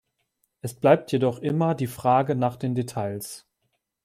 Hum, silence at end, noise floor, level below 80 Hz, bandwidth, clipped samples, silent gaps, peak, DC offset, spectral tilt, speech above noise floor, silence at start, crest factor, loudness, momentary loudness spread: none; 0.65 s; -76 dBFS; -64 dBFS; 16 kHz; under 0.1%; none; -6 dBFS; under 0.1%; -7 dB/octave; 53 dB; 0.65 s; 20 dB; -24 LUFS; 17 LU